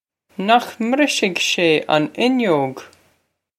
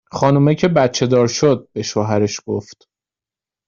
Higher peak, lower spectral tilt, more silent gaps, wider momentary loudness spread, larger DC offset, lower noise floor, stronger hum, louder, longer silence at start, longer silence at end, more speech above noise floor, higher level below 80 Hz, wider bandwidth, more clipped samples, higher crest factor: about the same, 0 dBFS vs 0 dBFS; second, -4 dB/octave vs -6 dB/octave; neither; about the same, 10 LU vs 9 LU; neither; second, -66 dBFS vs -90 dBFS; neither; about the same, -17 LUFS vs -16 LUFS; first, 0.4 s vs 0.15 s; second, 0.7 s vs 0.95 s; second, 48 dB vs 74 dB; second, -66 dBFS vs -54 dBFS; first, 15.5 kHz vs 7.4 kHz; neither; about the same, 18 dB vs 18 dB